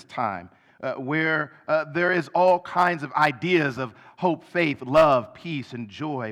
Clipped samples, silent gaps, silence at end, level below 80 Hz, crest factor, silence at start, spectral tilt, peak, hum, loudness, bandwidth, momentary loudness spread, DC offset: under 0.1%; none; 0 s; -60 dBFS; 16 dB; 0.1 s; -6.5 dB/octave; -8 dBFS; none; -23 LUFS; 13.5 kHz; 13 LU; under 0.1%